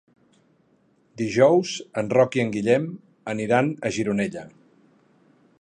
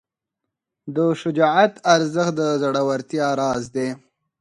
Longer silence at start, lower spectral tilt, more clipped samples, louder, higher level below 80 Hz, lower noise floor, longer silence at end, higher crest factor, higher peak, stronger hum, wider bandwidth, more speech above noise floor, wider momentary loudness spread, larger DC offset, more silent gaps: first, 1.15 s vs 0.85 s; about the same, -6 dB/octave vs -5 dB/octave; neither; second, -23 LUFS vs -20 LUFS; about the same, -62 dBFS vs -62 dBFS; second, -63 dBFS vs -82 dBFS; first, 1.1 s vs 0.45 s; about the same, 20 dB vs 20 dB; second, -4 dBFS vs 0 dBFS; neither; second, 10 kHz vs 11.5 kHz; second, 41 dB vs 63 dB; about the same, 13 LU vs 11 LU; neither; neither